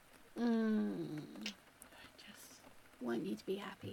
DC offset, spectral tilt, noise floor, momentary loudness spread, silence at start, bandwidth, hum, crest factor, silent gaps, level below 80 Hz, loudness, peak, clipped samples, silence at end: under 0.1%; -6 dB/octave; -60 dBFS; 22 LU; 0.1 s; 17.5 kHz; none; 14 dB; none; -76 dBFS; -41 LUFS; -28 dBFS; under 0.1%; 0 s